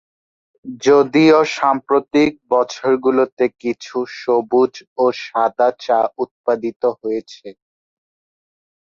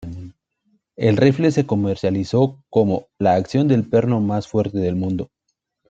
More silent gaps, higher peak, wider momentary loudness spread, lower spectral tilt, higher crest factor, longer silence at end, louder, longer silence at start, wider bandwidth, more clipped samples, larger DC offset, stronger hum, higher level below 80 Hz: first, 3.32-3.37 s, 4.87-4.96 s, 6.31-6.44 s, 6.76-6.80 s vs none; about the same, -2 dBFS vs -2 dBFS; first, 12 LU vs 8 LU; second, -5.5 dB/octave vs -8 dB/octave; about the same, 16 dB vs 18 dB; first, 1.3 s vs 0.65 s; about the same, -17 LUFS vs -19 LUFS; first, 0.65 s vs 0 s; about the same, 7.6 kHz vs 8 kHz; neither; neither; neither; second, -62 dBFS vs -54 dBFS